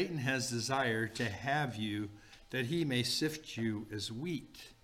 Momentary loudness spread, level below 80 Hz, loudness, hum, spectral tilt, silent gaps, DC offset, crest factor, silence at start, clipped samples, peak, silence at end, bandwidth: 8 LU; -64 dBFS; -36 LUFS; none; -4.5 dB/octave; none; under 0.1%; 16 dB; 0 s; under 0.1%; -20 dBFS; 0.1 s; 16.5 kHz